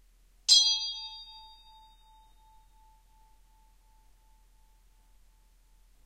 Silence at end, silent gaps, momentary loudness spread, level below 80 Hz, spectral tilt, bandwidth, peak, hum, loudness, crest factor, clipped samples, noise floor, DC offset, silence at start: 4.75 s; none; 27 LU; -62 dBFS; 4.5 dB/octave; 16 kHz; -8 dBFS; none; -23 LUFS; 28 dB; under 0.1%; -62 dBFS; under 0.1%; 0.5 s